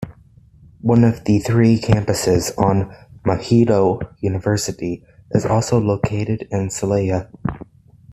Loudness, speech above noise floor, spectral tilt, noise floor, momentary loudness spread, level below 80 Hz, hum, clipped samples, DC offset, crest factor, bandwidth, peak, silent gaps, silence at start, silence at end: -18 LUFS; 31 dB; -6.5 dB/octave; -48 dBFS; 12 LU; -42 dBFS; none; under 0.1%; under 0.1%; 18 dB; 13.5 kHz; 0 dBFS; none; 0 s; 0.5 s